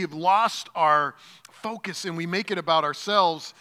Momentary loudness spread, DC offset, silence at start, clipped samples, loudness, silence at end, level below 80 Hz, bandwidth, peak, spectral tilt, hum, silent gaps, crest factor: 11 LU; under 0.1%; 0 s; under 0.1%; -24 LUFS; 0.1 s; -86 dBFS; 16 kHz; -6 dBFS; -3.5 dB/octave; none; none; 18 dB